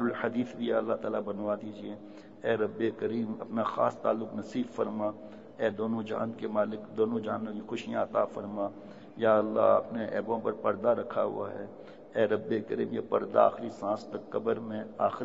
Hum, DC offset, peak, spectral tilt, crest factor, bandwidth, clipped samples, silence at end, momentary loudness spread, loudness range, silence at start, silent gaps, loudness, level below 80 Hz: none; 0.1%; -10 dBFS; -7.5 dB/octave; 20 dB; 7.8 kHz; under 0.1%; 0 s; 12 LU; 4 LU; 0 s; none; -31 LUFS; -74 dBFS